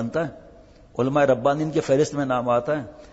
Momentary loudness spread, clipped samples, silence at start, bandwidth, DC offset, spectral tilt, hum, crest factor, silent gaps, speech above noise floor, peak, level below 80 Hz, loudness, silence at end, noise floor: 9 LU; under 0.1%; 0 s; 8 kHz; under 0.1%; -6.5 dB/octave; none; 16 dB; none; 26 dB; -8 dBFS; -54 dBFS; -23 LUFS; 0.05 s; -49 dBFS